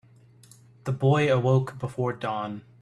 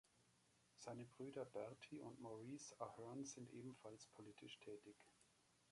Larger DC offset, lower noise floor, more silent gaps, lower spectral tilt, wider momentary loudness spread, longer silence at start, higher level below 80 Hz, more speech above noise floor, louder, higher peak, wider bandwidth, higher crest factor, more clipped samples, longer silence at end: neither; second, -54 dBFS vs -79 dBFS; neither; first, -7.5 dB/octave vs -4.5 dB/octave; first, 12 LU vs 8 LU; first, 0.85 s vs 0.05 s; first, -60 dBFS vs -90 dBFS; first, 29 dB vs 23 dB; first, -26 LUFS vs -57 LUFS; first, -8 dBFS vs -36 dBFS; about the same, 11 kHz vs 11.5 kHz; about the same, 18 dB vs 22 dB; neither; first, 0.2 s vs 0 s